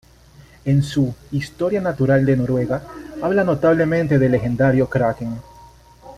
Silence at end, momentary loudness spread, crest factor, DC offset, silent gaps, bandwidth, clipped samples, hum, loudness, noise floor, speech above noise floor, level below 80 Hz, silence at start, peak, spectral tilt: 0 s; 10 LU; 16 dB; under 0.1%; none; 12.5 kHz; under 0.1%; none; -19 LUFS; -47 dBFS; 29 dB; -44 dBFS; 0.65 s; -4 dBFS; -8 dB/octave